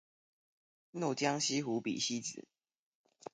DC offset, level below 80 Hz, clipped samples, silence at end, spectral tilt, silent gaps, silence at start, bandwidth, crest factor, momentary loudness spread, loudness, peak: under 0.1%; -84 dBFS; under 0.1%; 0.9 s; -3 dB/octave; none; 0.95 s; 9.6 kHz; 20 dB; 17 LU; -35 LUFS; -18 dBFS